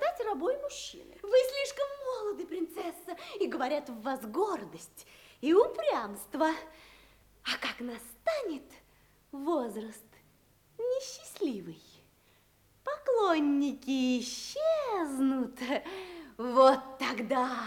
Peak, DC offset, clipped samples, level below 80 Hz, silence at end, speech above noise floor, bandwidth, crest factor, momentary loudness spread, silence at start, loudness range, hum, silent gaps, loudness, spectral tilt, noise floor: -10 dBFS; under 0.1%; under 0.1%; -68 dBFS; 0 s; 35 dB; 18.5 kHz; 22 dB; 16 LU; 0 s; 8 LU; none; none; -32 LUFS; -3.5 dB/octave; -66 dBFS